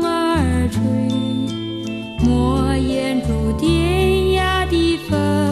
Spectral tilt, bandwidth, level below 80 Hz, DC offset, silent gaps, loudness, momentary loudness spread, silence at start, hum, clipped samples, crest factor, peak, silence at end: -6.5 dB/octave; 13 kHz; -28 dBFS; under 0.1%; none; -18 LUFS; 6 LU; 0 s; none; under 0.1%; 12 dB; -4 dBFS; 0 s